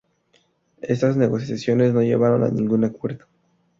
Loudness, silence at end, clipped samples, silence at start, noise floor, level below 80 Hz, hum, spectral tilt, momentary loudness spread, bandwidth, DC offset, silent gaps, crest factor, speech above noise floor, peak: -20 LUFS; 0.65 s; under 0.1%; 0.85 s; -63 dBFS; -58 dBFS; none; -8.5 dB/octave; 13 LU; 7.6 kHz; under 0.1%; none; 16 dB; 44 dB; -6 dBFS